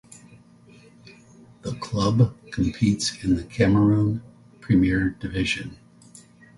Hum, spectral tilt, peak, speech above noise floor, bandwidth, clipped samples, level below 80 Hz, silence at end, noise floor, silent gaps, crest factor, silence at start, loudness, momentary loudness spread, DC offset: none; -6 dB/octave; -6 dBFS; 29 dB; 11.5 kHz; under 0.1%; -44 dBFS; 0.85 s; -51 dBFS; none; 18 dB; 1.65 s; -23 LUFS; 14 LU; under 0.1%